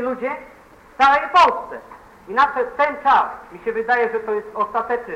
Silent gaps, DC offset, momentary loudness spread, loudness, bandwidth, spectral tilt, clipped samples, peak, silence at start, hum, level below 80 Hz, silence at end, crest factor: none; under 0.1%; 14 LU; -19 LUFS; 11 kHz; -3.5 dB/octave; under 0.1%; -4 dBFS; 0 s; none; -54 dBFS; 0 s; 16 dB